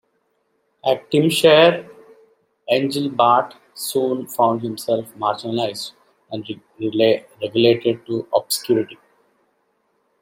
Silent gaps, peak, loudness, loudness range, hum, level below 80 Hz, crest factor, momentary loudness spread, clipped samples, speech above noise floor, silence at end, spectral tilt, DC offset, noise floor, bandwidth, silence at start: none; 0 dBFS; -19 LUFS; 5 LU; none; -68 dBFS; 20 dB; 16 LU; under 0.1%; 49 dB; 1.25 s; -4.5 dB/octave; under 0.1%; -67 dBFS; 16.5 kHz; 0.85 s